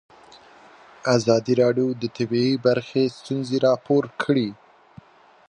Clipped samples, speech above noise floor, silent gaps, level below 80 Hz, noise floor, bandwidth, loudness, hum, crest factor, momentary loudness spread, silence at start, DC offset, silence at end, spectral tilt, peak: under 0.1%; 28 dB; none; -66 dBFS; -49 dBFS; 10 kHz; -22 LUFS; none; 18 dB; 7 LU; 1.05 s; under 0.1%; 0.95 s; -6 dB/octave; -4 dBFS